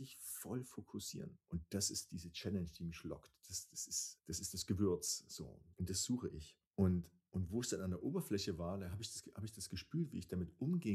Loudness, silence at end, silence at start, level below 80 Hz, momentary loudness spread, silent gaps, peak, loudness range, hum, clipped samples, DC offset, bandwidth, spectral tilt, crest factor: -43 LUFS; 0 s; 0 s; -64 dBFS; 11 LU; 6.67-6.71 s; -22 dBFS; 4 LU; none; under 0.1%; under 0.1%; 15 kHz; -4.5 dB/octave; 20 dB